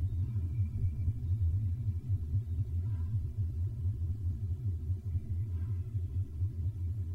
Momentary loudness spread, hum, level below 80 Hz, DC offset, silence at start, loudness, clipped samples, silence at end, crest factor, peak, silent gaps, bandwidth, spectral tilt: 3 LU; none; -42 dBFS; under 0.1%; 0 s; -36 LUFS; under 0.1%; 0 s; 12 dB; -22 dBFS; none; 2.4 kHz; -10 dB/octave